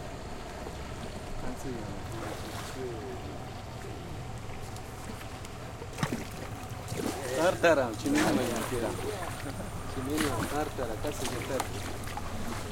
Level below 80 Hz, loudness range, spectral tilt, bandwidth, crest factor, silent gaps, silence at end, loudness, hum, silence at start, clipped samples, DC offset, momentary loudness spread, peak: -46 dBFS; 10 LU; -5 dB/octave; 17 kHz; 22 dB; none; 0 s; -34 LUFS; none; 0 s; under 0.1%; under 0.1%; 13 LU; -10 dBFS